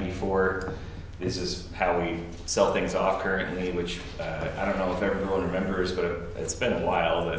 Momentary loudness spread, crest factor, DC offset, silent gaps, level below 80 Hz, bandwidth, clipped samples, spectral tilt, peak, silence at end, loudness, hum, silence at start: 9 LU; 20 dB; under 0.1%; none; -42 dBFS; 8 kHz; under 0.1%; -5 dB/octave; -8 dBFS; 0 s; -28 LUFS; none; 0 s